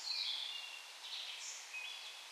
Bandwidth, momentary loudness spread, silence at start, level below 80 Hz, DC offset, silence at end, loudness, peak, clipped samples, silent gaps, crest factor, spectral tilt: 15.5 kHz; 10 LU; 0 s; under -90 dBFS; under 0.1%; 0 s; -43 LUFS; -28 dBFS; under 0.1%; none; 18 dB; 6.5 dB/octave